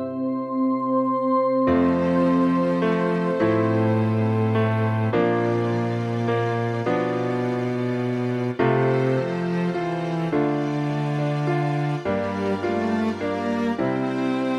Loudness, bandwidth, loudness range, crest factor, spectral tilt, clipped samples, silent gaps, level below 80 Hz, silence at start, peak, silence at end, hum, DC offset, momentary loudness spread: -23 LUFS; 9.8 kHz; 3 LU; 14 dB; -8.5 dB/octave; under 0.1%; none; -58 dBFS; 0 s; -8 dBFS; 0 s; none; under 0.1%; 5 LU